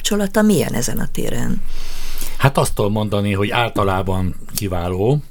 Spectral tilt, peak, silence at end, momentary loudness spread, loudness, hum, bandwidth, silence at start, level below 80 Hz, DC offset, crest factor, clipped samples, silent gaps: -5 dB/octave; 0 dBFS; 0 s; 12 LU; -19 LUFS; none; 19 kHz; 0 s; -24 dBFS; under 0.1%; 16 dB; under 0.1%; none